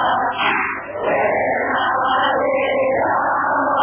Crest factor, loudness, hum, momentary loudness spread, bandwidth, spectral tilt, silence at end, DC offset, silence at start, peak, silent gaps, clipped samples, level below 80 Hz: 12 dB; -18 LUFS; none; 3 LU; 3.5 kHz; -7.5 dB/octave; 0 s; under 0.1%; 0 s; -6 dBFS; none; under 0.1%; -52 dBFS